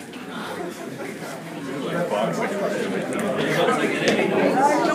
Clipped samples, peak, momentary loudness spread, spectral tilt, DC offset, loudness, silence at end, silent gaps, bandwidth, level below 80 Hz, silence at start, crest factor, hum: under 0.1%; -4 dBFS; 13 LU; -5 dB/octave; under 0.1%; -23 LUFS; 0 s; none; 15.5 kHz; -72 dBFS; 0 s; 18 dB; none